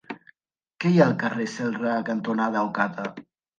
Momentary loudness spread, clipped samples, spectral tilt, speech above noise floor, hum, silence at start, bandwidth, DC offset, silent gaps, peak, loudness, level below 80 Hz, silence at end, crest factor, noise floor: 15 LU; under 0.1%; -7 dB/octave; 56 dB; none; 0.1 s; 8.8 kHz; under 0.1%; none; -6 dBFS; -24 LUFS; -72 dBFS; 0.4 s; 20 dB; -80 dBFS